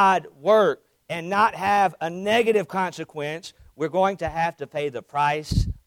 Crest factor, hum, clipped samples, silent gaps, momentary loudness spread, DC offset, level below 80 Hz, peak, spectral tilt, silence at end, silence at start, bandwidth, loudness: 16 dB; none; under 0.1%; none; 12 LU; under 0.1%; -40 dBFS; -6 dBFS; -5.5 dB/octave; 0.15 s; 0 s; 16.5 kHz; -23 LUFS